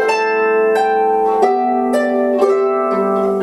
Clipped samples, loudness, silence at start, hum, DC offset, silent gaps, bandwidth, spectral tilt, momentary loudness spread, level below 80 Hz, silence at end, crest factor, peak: under 0.1%; -15 LUFS; 0 s; none; under 0.1%; none; 12 kHz; -5.5 dB/octave; 2 LU; -56 dBFS; 0 s; 14 dB; 0 dBFS